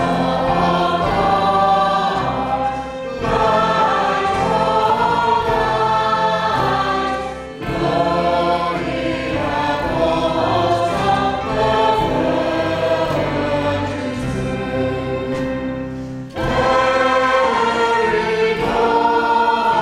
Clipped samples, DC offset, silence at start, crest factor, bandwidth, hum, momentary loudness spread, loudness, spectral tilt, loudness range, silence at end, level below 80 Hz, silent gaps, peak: under 0.1%; under 0.1%; 0 s; 14 dB; 14.5 kHz; none; 7 LU; -17 LUFS; -5.5 dB/octave; 4 LU; 0 s; -38 dBFS; none; -4 dBFS